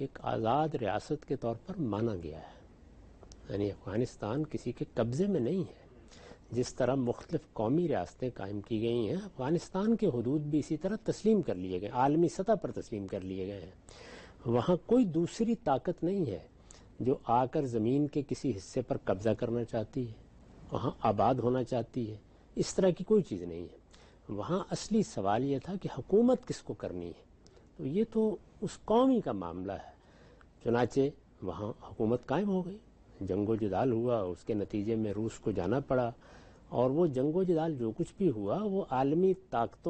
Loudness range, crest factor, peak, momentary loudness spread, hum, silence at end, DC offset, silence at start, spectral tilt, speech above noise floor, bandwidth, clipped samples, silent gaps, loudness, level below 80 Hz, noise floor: 4 LU; 16 dB; -16 dBFS; 12 LU; none; 0 s; under 0.1%; 0 s; -7.5 dB/octave; 27 dB; 8.4 kHz; under 0.1%; none; -33 LUFS; -58 dBFS; -59 dBFS